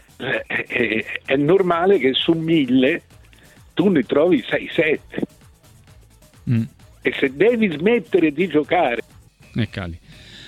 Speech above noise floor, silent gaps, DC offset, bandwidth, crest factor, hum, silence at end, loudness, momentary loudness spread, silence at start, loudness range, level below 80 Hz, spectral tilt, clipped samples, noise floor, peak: 30 dB; none; under 0.1%; 13 kHz; 16 dB; none; 0 s; -19 LUFS; 13 LU; 0.2 s; 4 LU; -52 dBFS; -7 dB/octave; under 0.1%; -49 dBFS; -4 dBFS